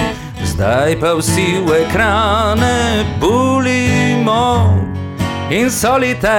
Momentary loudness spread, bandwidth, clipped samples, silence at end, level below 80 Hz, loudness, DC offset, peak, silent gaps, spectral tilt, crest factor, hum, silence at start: 7 LU; 17 kHz; under 0.1%; 0 s; -30 dBFS; -14 LUFS; under 0.1%; -4 dBFS; none; -5 dB/octave; 10 dB; none; 0 s